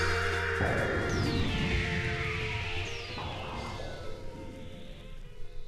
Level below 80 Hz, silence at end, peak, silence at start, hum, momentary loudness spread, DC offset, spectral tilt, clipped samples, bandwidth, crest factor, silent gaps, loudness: -42 dBFS; 0 s; -16 dBFS; 0 s; none; 18 LU; under 0.1%; -5 dB/octave; under 0.1%; 13.5 kHz; 16 dB; none; -32 LUFS